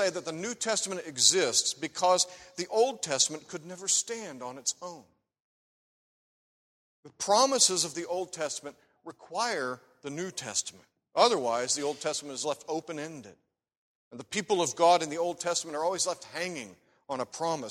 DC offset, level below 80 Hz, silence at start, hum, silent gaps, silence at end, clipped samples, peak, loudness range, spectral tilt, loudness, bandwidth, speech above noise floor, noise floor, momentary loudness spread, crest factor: under 0.1%; -76 dBFS; 0 s; none; 5.40-7.03 s, 13.77-14.11 s; 0 s; under 0.1%; -6 dBFS; 8 LU; -1.5 dB/octave; -29 LUFS; 16 kHz; over 60 dB; under -90 dBFS; 17 LU; 24 dB